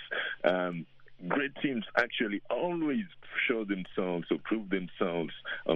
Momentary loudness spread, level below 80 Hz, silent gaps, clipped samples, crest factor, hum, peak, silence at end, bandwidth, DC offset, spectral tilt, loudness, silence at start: 7 LU; -66 dBFS; none; under 0.1%; 24 dB; none; -8 dBFS; 0 s; 6.8 kHz; under 0.1%; -3.5 dB/octave; -32 LUFS; 0 s